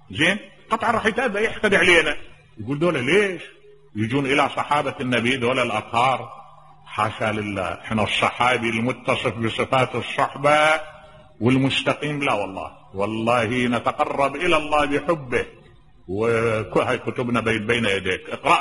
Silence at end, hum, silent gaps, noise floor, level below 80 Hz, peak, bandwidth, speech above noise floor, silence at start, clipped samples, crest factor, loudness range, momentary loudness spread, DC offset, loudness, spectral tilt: 0 s; none; none; -48 dBFS; -50 dBFS; -2 dBFS; 11.5 kHz; 27 dB; 0.1 s; under 0.1%; 20 dB; 3 LU; 9 LU; under 0.1%; -21 LUFS; -5 dB/octave